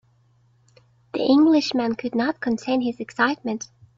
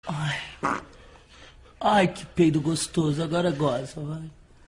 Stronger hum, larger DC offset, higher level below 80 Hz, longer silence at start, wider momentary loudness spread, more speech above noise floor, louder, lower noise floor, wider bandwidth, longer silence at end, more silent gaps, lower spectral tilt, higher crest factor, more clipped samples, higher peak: neither; neither; second, -64 dBFS vs -52 dBFS; first, 1.15 s vs 0.05 s; about the same, 12 LU vs 13 LU; first, 39 dB vs 25 dB; first, -22 LUFS vs -26 LUFS; first, -60 dBFS vs -50 dBFS; second, 7.6 kHz vs 14.5 kHz; about the same, 0.3 s vs 0.35 s; neither; about the same, -4.5 dB/octave vs -5.5 dB/octave; about the same, 18 dB vs 18 dB; neither; about the same, -6 dBFS vs -8 dBFS